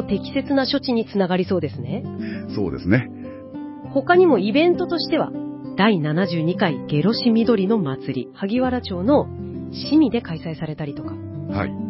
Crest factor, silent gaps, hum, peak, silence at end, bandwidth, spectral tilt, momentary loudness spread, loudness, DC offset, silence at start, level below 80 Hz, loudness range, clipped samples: 18 dB; none; none; -4 dBFS; 0 s; 5.8 kHz; -10.5 dB/octave; 13 LU; -21 LUFS; under 0.1%; 0 s; -46 dBFS; 4 LU; under 0.1%